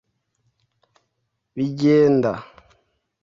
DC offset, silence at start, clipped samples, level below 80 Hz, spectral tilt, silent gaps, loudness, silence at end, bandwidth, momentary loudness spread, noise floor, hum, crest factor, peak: under 0.1%; 1.55 s; under 0.1%; -60 dBFS; -8 dB/octave; none; -19 LUFS; 0.8 s; 7.4 kHz; 18 LU; -75 dBFS; none; 16 dB; -6 dBFS